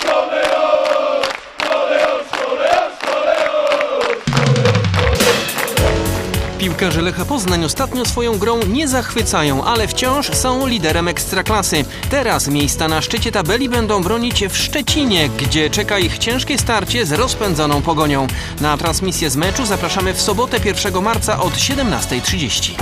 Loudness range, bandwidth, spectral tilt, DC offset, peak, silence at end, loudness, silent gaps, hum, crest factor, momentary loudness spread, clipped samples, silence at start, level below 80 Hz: 1 LU; 15.5 kHz; -4 dB/octave; under 0.1%; 0 dBFS; 0 s; -16 LUFS; none; none; 16 dB; 4 LU; under 0.1%; 0 s; -30 dBFS